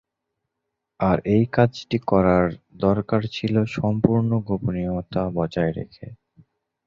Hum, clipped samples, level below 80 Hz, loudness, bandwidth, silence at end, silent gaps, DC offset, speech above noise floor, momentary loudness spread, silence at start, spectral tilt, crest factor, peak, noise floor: none; under 0.1%; -46 dBFS; -22 LUFS; 7.4 kHz; 0.75 s; none; under 0.1%; 60 dB; 8 LU; 1 s; -8.5 dB/octave; 20 dB; -2 dBFS; -81 dBFS